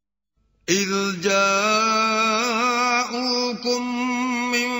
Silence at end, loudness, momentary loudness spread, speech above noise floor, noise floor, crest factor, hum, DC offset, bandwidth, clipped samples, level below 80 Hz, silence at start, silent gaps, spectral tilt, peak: 0 s; -20 LUFS; 5 LU; 50 dB; -70 dBFS; 18 dB; none; under 0.1%; 16 kHz; under 0.1%; -64 dBFS; 0.7 s; none; -2.5 dB/octave; -4 dBFS